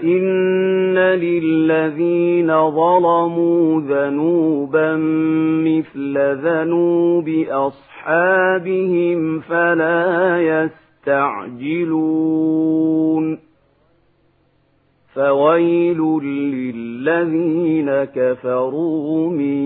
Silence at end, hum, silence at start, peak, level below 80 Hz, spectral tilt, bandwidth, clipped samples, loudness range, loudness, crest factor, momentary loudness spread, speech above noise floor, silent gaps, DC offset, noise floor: 0 s; none; 0 s; -2 dBFS; -66 dBFS; -12 dB/octave; 4 kHz; under 0.1%; 4 LU; -17 LUFS; 14 dB; 7 LU; 43 dB; none; under 0.1%; -59 dBFS